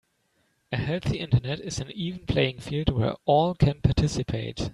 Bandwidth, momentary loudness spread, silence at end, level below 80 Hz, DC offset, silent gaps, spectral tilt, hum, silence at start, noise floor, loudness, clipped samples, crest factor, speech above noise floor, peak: 11.5 kHz; 9 LU; 0 s; -40 dBFS; under 0.1%; none; -6.5 dB/octave; none; 0.7 s; -70 dBFS; -26 LUFS; under 0.1%; 20 dB; 45 dB; -6 dBFS